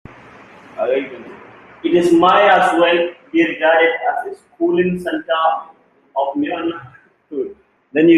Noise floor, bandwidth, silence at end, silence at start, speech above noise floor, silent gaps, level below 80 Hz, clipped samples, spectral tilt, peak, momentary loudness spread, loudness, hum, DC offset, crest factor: -41 dBFS; 11.5 kHz; 0 s; 0.75 s; 26 dB; none; -58 dBFS; under 0.1%; -6 dB/octave; 0 dBFS; 18 LU; -16 LUFS; none; under 0.1%; 16 dB